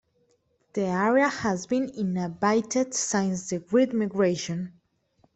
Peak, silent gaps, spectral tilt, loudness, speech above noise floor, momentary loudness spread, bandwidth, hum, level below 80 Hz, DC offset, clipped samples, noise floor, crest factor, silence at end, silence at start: -8 dBFS; none; -5 dB/octave; -26 LUFS; 43 dB; 8 LU; 8.4 kHz; none; -64 dBFS; under 0.1%; under 0.1%; -69 dBFS; 18 dB; 0.65 s; 0.75 s